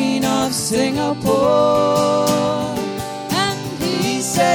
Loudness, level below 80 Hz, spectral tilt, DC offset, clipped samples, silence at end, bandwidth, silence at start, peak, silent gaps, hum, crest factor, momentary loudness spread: -18 LUFS; -48 dBFS; -4 dB/octave; under 0.1%; under 0.1%; 0 s; 17.5 kHz; 0 s; -4 dBFS; none; none; 14 dB; 8 LU